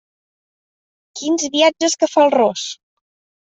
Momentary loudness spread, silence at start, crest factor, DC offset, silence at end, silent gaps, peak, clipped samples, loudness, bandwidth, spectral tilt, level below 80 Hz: 15 LU; 1.15 s; 16 dB; under 0.1%; 0.7 s; none; -2 dBFS; under 0.1%; -16 LUFS; 8.2 kHz; -2 dB/octave; -68 dBFS